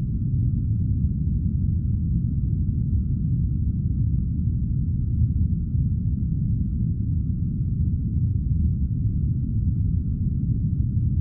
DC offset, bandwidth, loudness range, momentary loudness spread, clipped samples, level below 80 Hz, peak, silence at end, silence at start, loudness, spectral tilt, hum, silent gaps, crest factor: under 0.1%; 0.7 kHz; 0 LU; 2 LU; under 0.1%; -28 dBFS; -12 dBFS; 0 s; 0 s; -25 LUFS; -18 dB/octave; none; none; 12 dB